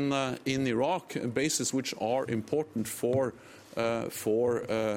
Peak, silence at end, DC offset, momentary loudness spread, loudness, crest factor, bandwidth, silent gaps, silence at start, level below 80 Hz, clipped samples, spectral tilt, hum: -14 dBFS; 0 s; under 0.1%; 5 LU; -30 LUFS; 16 dB; 16.5 kHz; none; 0 s; -66 dBFS; under 0.1%; -4.5 dB/octave; none